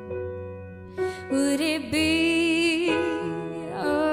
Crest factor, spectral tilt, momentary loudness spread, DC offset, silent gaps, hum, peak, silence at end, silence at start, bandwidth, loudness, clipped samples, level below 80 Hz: 14 dB; -4 dB/octave; 14 LU; under 0.1%; none; none; -12 dBFS; 0 s; 0 s; 15.5 kHz; -25 LUFS; under 0.1%; -54 dBFS